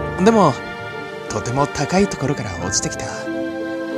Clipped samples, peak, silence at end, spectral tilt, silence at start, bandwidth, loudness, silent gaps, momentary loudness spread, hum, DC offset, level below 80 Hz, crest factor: under 0.1%; 0 dBFS; 0 s; -4.5 dB/octave; 0 s; 14 kHz; -20 LUFS; none; 13 LU; none; under 0.1%; -42 dBFS; 20 dB